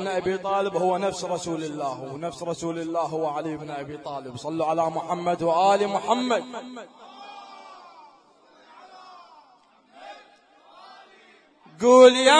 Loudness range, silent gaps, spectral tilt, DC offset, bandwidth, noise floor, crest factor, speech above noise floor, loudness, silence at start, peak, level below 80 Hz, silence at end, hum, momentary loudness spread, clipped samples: 21 LU; none; -4 dB/octave; under 0.1%; 10.5 kHz; -58 dBFS; 22 dB; 35 dB; -23 LUFS; 0 s; -4 dBFS; -68 dBFS; 0 s; none; 23 LU; under 0.1%